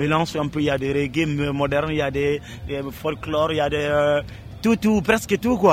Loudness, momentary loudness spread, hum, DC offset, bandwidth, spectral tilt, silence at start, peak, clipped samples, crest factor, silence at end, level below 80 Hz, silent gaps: -22 LUFS; 9 LU; none; under 0.1%; 16 kHz; -6 dB/octave; 0 s; -4 dBFS; under 0.1%; 18 dB; 0 s; -42 dBFS; none